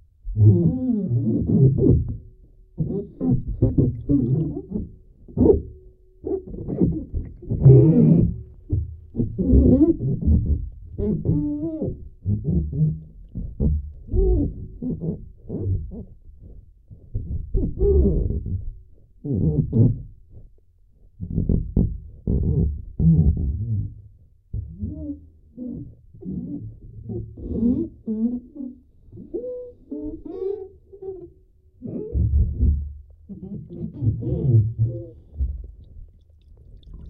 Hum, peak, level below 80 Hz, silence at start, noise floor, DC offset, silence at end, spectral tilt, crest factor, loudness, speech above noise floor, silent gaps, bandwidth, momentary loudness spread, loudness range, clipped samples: none; -2 dBFS; -30 dBFS; 0.25 s; -54 dBFS; under 0.1%; 0 s; -15.5 dB/octave; 20 dB; -22 LUFS; 35 dB; none; 1.4 kHz; 19 LU; 12 LU; under 0.1%